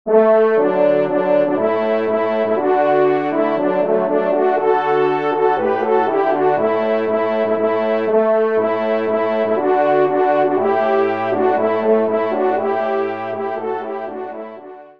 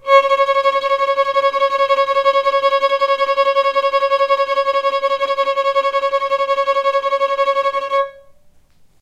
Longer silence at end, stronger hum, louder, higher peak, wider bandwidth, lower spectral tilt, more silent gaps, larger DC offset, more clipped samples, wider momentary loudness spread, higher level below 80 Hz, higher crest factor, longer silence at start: second, 0.1 s vs 0.8 s; neither; about the same, -17 LUFS vs -16 LUFS; about the same, -2 dBFS vs -2 dBFS; second, 5.4 kHz vs 9.2 kHz; first, -8 dB/octave vs -1 dB/octave; neither; first, 0.4% vs under 0.1%; neither; first, 8 LU vs 3 LU; second, -68 dBFS vs -60 dBFS; about the same, 14 dB vs 14 dB; about the same, 0.05 s vs 0.05 s